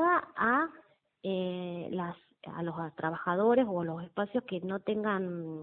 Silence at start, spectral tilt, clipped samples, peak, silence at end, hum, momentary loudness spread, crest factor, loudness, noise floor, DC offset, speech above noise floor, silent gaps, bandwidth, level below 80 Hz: 0 s; -10 dB/octave; under 0.1%; -14 dBFS; 0 s; none; 11 LU; 18 dB; -32 LUFS; -61 dBFS; under 0.1%; 29 dB; none; 4.3 kHz; -72 dBFS